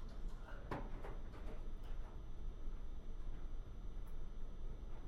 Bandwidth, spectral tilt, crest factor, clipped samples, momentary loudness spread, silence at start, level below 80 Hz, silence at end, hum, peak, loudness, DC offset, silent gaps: 6.4 kHz; -7 dB/octave; 16 dB; under 0.1%; 5 LU; 0 s; -46 dBFS; 0 s; none; -28 dBFS; -53 LUFS; under 0.1%; none